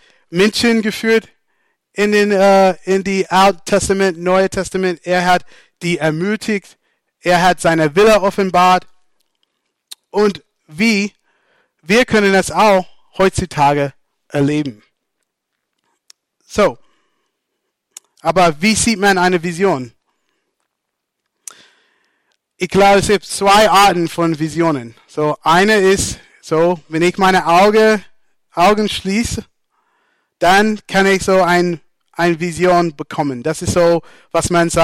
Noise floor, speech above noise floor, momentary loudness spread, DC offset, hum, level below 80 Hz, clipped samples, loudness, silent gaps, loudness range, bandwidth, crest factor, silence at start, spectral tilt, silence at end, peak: -76 dBFS; 62 dB; 11 LU; under 0.1%; none; -42 dBFS; under 0.1%; -14 LUFS; none; 7 LU; 16.5 kHz; 14 dB; 0.3 s; -4.5 dB/octave; 0 s; -2 dBFS